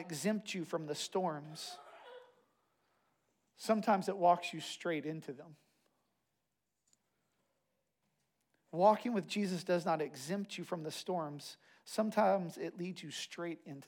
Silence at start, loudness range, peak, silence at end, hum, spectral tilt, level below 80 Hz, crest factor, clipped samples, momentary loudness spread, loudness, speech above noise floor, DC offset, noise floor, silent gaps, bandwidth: 0 s; 7 LU; -16 dBFS; 0 s; none; -5 dB/octave; under -90 dBFS; 22 dB; under 0.1%; 16 LU; -37 LUFS; 51 dB; under 0.1%; -87 dBFS; none; 17.5 kHz